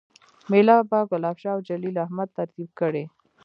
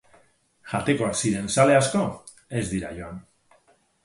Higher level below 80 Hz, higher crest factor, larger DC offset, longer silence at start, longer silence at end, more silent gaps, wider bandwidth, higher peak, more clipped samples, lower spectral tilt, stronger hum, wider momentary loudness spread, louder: second, -76 dBFS vs -52 dBFS; about the same, 20 dB vs 20 dB; neither; second, 0.5 s vs 0.65 s; second, 0.35 s vs 0.85 s; neither; second, 6.8 kHz vs 11.5 kHz; about the same, -4 dBFS vs -6 dBFS; neither; first, -9 dB/octave vs -5 dB/octave; neither; second, 15 LU vs 20 LU; about the same, -23 LUFS vs -24 LUFS